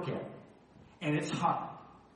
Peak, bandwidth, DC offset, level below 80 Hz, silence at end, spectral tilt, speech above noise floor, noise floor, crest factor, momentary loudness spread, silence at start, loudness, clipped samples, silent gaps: -18 dBFS; 11 kHz; under 0.1%; -70 dBFS; 0.15 s; -6 dB/octave; 25 dB; -58 dBFS; 20 dB; 18 LU; 0 s; -35 LUFS; under 0.1%; none